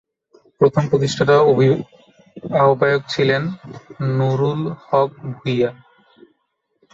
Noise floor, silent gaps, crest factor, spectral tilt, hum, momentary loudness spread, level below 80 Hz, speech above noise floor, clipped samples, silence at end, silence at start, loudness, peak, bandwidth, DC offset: -70 dBFS; none; 18 dB; -6.5 dB/octave; none; 13 LU; -56 dBFS; 53 dB; under 0.1%; 1.2 s; 0.6 s; -18 LUFS; -2 dBFS; 7.8 kHz; under 0.1%